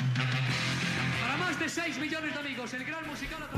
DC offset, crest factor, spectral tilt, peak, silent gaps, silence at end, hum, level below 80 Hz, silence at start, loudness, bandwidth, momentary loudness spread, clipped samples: under 0.1%; 16 dB; -4.5 dB/octave; -16 dBFS; none; 0 s; none; -56 dBFS; 0 s; -31 LUFS; 14 kHz; 7 LU; under 0.1%